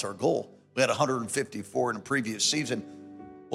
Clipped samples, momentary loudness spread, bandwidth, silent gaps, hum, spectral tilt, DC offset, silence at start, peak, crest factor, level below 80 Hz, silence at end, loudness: under 0.1%; 19 LU; 16 kHz; none; none; -3.5 dB/octave; under 0.1%; 0 s; -10 dBFS; 20 dB; -74 dBFS; 0 s; -28 LUFS